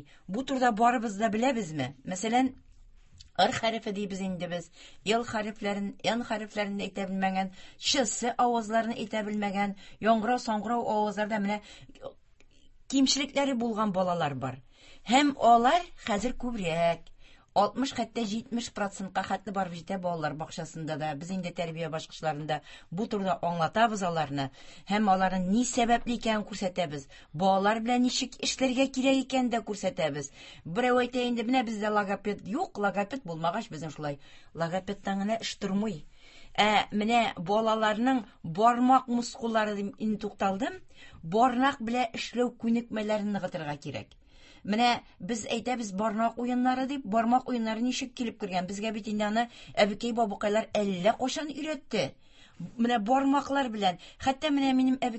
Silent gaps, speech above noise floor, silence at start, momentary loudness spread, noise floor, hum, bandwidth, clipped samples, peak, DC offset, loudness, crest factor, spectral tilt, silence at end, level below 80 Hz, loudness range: none; 27 dB; 0 s; 11 LU; -56 dBFS; none; 8.6 kHz; under 0.1%; -8 dBFS; under 0.1%; -29 LUFS; 22 dB; -4.5 dB/octave; 0 s; -58 dBFS; 5 LU